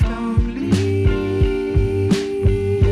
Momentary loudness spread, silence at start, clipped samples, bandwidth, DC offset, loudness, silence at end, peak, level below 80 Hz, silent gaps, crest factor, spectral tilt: 2 LU; 0 s; under 0.1%; 11.5 kHz; under 0.1%; -19 LUFS; 0 s; -6 dBFS; -24 dBFS; none; 10 dB; -7.5 dB/octave